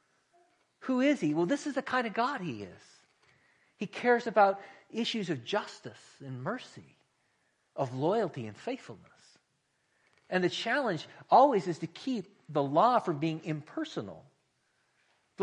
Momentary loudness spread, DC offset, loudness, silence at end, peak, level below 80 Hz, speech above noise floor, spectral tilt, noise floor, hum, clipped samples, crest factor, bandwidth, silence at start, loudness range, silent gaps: 18 LU; under 0.1%; -31 LUFS; 0 s; -10 dBFS; -78 dBFS; 46 dB; -5.5 dB/octave; -76 dBFS; none; under 0.1%; 22 dB; 10.5 kHz; 0.8 s; 9 LU; none